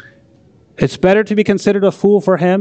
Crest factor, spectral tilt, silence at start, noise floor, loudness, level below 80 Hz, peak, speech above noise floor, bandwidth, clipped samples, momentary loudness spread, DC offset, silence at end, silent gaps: 12 dB; -7 dB/octave; 0.8 s; -48 dBFS; -13 LUFS; -48 dBFS; -2 dBFS; 36 dB; 8.6 kHz; under 0.1%; 4 LU; under 0.1%; 0 s; none